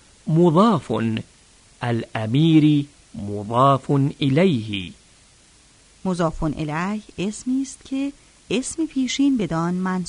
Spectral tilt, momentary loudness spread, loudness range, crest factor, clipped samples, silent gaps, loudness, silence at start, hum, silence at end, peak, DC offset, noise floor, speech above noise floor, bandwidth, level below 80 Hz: -6.5 dB/octave; 14 LU; 7 LU; 18 dB; under 0.1%; none; -21 LUFS; 0.25 s; none; 0 s; -4 dBFS; under 0.1%; -53 dBFS; 33 dB; 10.5 kHz; -46 dBFS